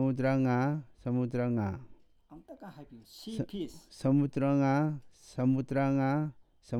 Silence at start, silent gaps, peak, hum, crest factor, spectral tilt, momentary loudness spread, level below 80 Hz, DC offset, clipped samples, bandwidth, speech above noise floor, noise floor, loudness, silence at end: 0 s; none; -16 dBFS; none; 14 dB; -8.5 dB/octave; 20 LU; -62 dBFS; under 0.1%; under 0.1%; 11.5 kHz; 25 dB; -55 dBFS; -31 LUFS; 0 s